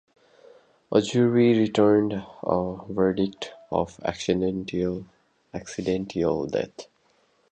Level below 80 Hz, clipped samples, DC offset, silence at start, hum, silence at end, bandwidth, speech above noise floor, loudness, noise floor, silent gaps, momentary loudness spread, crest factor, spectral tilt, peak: -54 dBFS; under 0.1%; under 0.1%; 0.9 s; none; 0.7 s; 9.2 kHz; 41 dB; -25 LUFS; -65 dBFS; none; 15 LU; 20 dB; -6.5 dB/octave; -6 dBFS